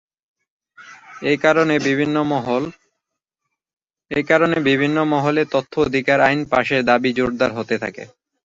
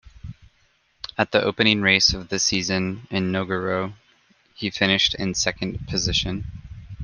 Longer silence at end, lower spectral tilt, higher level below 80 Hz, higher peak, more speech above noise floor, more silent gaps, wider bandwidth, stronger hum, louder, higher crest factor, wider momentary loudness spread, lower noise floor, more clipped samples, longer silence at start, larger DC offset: first, 0.4 s vs 0 s; first, -6 dB/octave vs -3 dB/octave; second, -54 dBFS vs -44 dBFS; about the same, -2 dBFS vs -2 dBFS; first, 62 dB vs 41 dB; neither; second, 7.8 kHz vs 10.5 kHz; neither; first, -18 LUFS vs -21 LUFS; about the same, 18 dB vs 22 dB; second, 9 LU vs 20 LU; first, -80 dBFS vs -63 dBFS; neither; first, 0.8 s vs 0.05 s; neither